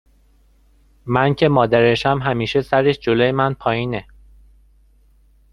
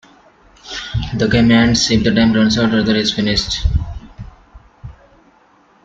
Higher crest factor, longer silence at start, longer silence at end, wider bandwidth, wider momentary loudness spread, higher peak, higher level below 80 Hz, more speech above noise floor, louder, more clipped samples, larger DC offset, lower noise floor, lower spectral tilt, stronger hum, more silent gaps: about the same, 18 dB vs 16 dB; first, 1.05 s vs 0.65 s; first, 1.5 s vs 0.95 s; first, 11 kHz vs 7.8 kHz; second, 8 LU vs 14 LU; about the same, -2 dBFS vs -2 dBFS; second, -46 dBFS vs -30 dBFS; about the same, 37 dB vs 38 dB; second, -17 LUFS vs -14 LUFS; neither; neither; about the same, -54 dBFS vs -51 dBFS; first, -7 dB/octave vs -5 dB/octave; neither; neither